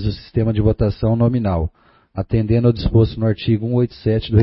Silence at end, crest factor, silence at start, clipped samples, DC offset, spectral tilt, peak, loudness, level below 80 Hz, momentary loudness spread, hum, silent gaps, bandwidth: 0 s; 16 dB; 0 s; under 0.1%; under 0.1%; -13 dB/octave; -2 dBFS; -18 LUFS; -32 dBFS; 6 LU; none; none; 5.8 kHz